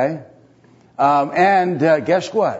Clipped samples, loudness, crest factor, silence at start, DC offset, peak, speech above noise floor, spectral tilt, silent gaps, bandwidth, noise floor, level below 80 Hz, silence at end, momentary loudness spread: under 0.1%; -16 LUFS; 14 dB; 0 s; under 0.1%; -2 dBFS; 34 dB; -6.5 dB/octave; none; 8 kHz; -51 dBFS; -68 dBFS; 0 s; 6 LU